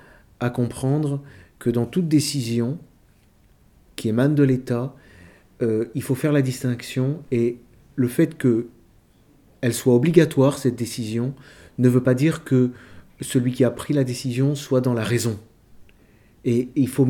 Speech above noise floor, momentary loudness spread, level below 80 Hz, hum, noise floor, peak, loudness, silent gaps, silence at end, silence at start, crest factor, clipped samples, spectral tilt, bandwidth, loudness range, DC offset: 35 dB; 10 LU; -56 dBFS; none; -56 dBFS; 0 dBFS; -22 LUFS; none; 0 s; 0.4 s; 22 dB; under 0.1%; -6.5 dB/octave; 18 kHz; 4 LU; under 0.1%